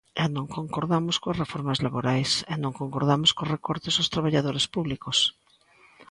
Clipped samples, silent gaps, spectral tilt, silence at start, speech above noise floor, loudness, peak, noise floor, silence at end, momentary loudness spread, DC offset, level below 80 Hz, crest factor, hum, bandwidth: under 0.1%; none; -4.5 dB/octave; 0.15 s; 32 dB; -25 LUFS; -8 dBFS; -58 dBFS; 0.1 s; 8 LU; under 0.1%; -56 dBFS; 20 dB; none; 11.5 kHz